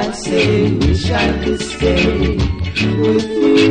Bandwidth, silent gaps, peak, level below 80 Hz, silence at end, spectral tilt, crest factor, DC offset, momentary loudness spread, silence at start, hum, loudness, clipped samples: 10 kHz; none; 0 dBFS; -24 dBFS; 0 s; -6 dB/octave; 14 dB; under 0.1%; 5 LU; 0 s; none; -15 LUFS; under 0.1%